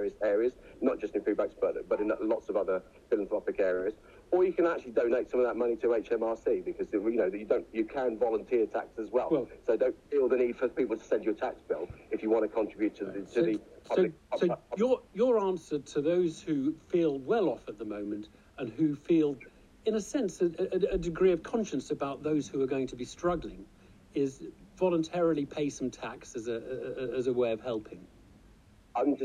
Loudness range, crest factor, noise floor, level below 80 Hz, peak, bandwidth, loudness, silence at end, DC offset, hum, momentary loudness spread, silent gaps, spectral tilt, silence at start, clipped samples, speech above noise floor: 3 LU; 16 dB; -58 dBFS; -58 dBFS; -14 dBFS; 10 kHz; -31 LUFS; 0 s; under 0.1%; none; 9 LU; none; -6.5 dB/octave; 0 s; under 0.1%; 28 dB